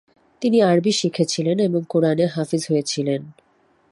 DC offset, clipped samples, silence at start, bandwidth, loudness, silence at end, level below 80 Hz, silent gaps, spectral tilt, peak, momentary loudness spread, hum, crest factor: under 0.1%; under 0.1%; 0.4 s; 11.5 kHz; -20 LUFS; 0.6 s; -66 dBFS; none; -5.5 dB/octave; -6 dBFS; 8 LU; none; 16 dB